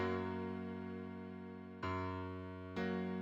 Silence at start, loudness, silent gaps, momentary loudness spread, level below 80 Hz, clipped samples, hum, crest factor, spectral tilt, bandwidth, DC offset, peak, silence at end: 0 s; -44 LUFS; none; 9 LU; -70 dBFS; under 0.1%; none; 14 dB; -8 dB/octave; 7.4 kHz; under 0.1%; -28 dBFS; 0 s